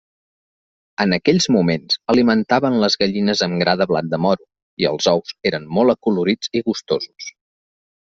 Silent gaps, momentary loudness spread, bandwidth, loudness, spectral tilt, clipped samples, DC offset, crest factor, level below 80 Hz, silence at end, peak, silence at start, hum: 4.62-4.77 s; 7 LU; 8 kHz; -18 LUFS; -5 dB/octave; under 0.1%; under 0.1%; 18 dB; -56 dBFS; 0.75 s; -2 dBFS; 1 s; none